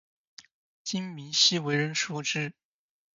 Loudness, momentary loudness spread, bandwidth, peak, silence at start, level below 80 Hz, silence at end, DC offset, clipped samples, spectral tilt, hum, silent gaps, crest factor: -27 LUFS; 13 LU; 7.8 kHz; -8 dBFS; 0.4 s; -76 dBFS; 0.65 s; under 0.1%; under 0.1%; -2.5 dB/octave; none; 0.51-0.85 s; 22 dB